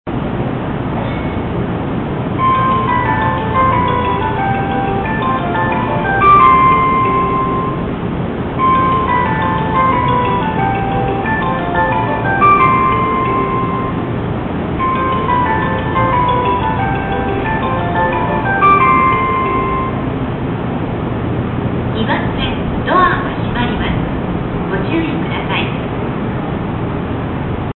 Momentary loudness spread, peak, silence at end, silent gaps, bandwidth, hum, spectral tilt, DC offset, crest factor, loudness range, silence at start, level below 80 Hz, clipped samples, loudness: 9 LU; 0 dBFS; 0.05 s; none; 4.2 kHz; none; -12.5 dB/octave; under 0.1%; 14 dB; 5 LU; 0.05 s; -30 dBFS; under 0.1%; -15 LUFS